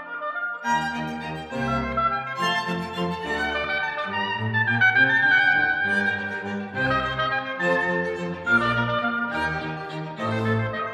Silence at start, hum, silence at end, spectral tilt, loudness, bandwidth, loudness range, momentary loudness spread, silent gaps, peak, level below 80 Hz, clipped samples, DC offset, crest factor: 0 s; none; 0 s; -5.5 dB/octave; -23 LUFS; 14 kHz; 5 LU; 12 LU; none; -8 dBFS; -50 dBFS; under 0.1%; under 0.1%; 16 dB